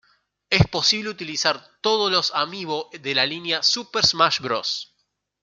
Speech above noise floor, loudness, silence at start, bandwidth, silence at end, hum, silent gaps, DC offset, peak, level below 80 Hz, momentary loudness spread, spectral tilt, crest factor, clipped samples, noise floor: 50 dB; -21 LUFS; 0.5 s; 12 kHz; 0.6 s; 50 Hz at -60 dBFS; none; under 0.1%; -2 dBFS; -50 dBFS; 10 LU; -3 dB/octave; 22 dB; under 0.1%; -73 dBFS